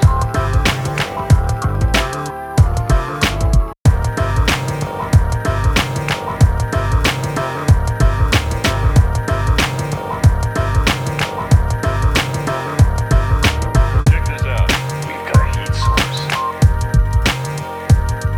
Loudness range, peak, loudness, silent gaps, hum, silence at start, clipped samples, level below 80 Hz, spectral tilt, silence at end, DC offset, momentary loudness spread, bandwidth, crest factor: 1 LU; 0 dBFS; -16 LUFS; 3.80-3.85 s; none; 0 s; under 0.1%; -20 dBFS; -5.5 dB/octave; 0 s; under 0.1%; 5 LU; 18 kHz; 14 dB